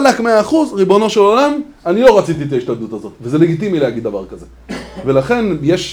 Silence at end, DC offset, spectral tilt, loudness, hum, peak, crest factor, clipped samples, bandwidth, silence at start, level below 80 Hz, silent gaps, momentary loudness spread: 0 s; under 0.1%; -6 dB/octave; -13 LUFS; none; 0 dBFS; 14 dB; 0.2%; over 20 kHz; 0 s; -44 dBFS; none; 16 LU